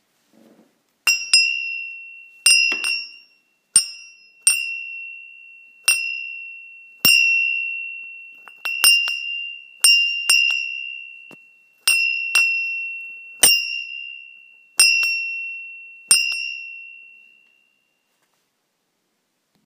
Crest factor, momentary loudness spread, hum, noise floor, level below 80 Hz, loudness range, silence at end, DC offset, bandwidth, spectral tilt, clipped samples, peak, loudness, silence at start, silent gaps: 22 dB; 21 LU; none; -72 dBFS; -70 dBFS; 6 LU; 2.6 s; under 0.1%; 15.5 kHz; 3 dB/octave; under 0.1%; 0 dBFS; -17 LUFS; 1.05 s; none